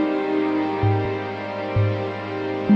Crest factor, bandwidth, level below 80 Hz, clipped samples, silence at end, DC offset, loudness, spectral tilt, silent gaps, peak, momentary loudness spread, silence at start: 14 dB; 6.2 kHz; -46 dBFS; under 0.1%; 0 s; under 0.1%; -24 LUFS; -9 dB/octave; none; -6 dBFS; 6 LU; 0 s